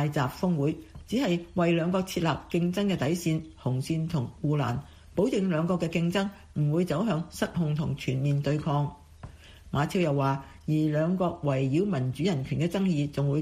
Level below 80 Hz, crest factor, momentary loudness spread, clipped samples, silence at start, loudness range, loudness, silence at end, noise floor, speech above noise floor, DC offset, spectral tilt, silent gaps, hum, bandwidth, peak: -52 dBFS; 14 dB; 6 LU; under 0.1%; 0 s; 2 LU; -28 LUFS; 0 s; -47 dBFS; 20 dB; under 0.1%; -7 dB/octave; none; none; 15.5 kHz; -12 dBFS